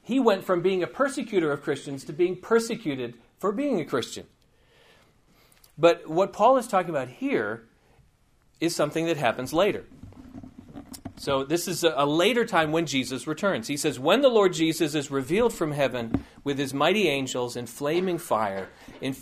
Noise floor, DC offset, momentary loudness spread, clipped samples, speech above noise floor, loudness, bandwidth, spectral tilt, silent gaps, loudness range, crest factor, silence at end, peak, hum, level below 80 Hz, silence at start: -63 dBFS; under 0.1%; 14 LU; under 0.1%; 38 dB; -25 LUFS; 15.5 kHz; -4.5 dB/octave; none; 5 LU; 20 dB; 0 s; -6 dBFS; none; -58 dBFS; 0.05 s